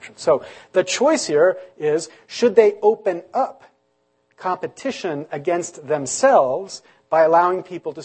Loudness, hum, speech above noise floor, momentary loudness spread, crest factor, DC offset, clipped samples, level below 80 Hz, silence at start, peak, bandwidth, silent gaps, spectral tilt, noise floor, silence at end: -19 LUFS; none; 47 dB; 12 LU; 18 dB; under 0.1%; under 0.1%; -72 dBFS; 0 s; 0 dBFS; 8.8 kHz; none; -3.5 dB/octave; -66 dBFS; 0 s